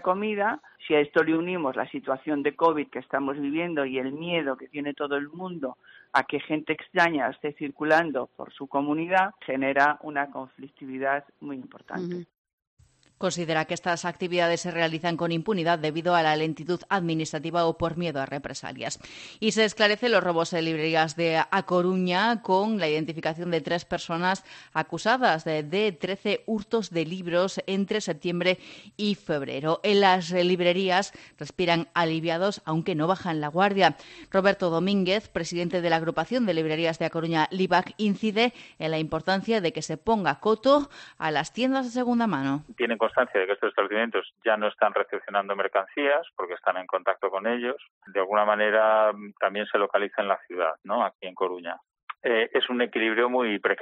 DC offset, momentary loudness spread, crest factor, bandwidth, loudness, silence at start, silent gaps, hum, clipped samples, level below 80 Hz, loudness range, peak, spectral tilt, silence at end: under 0.1%; 10 LU; 20 dB; 8.8 kHz; -26 LUFS; 0 s; 12.38-12.45 s, 12.53-12.58 s, 12.67-12.77 s, 47.90-48.01 s, 51.15-51.19 s, 52.03-52.07 s; none; under 0.1%; -64 dBFS; 4 LU; -6 dBFS; -5 dB/octave; 0 s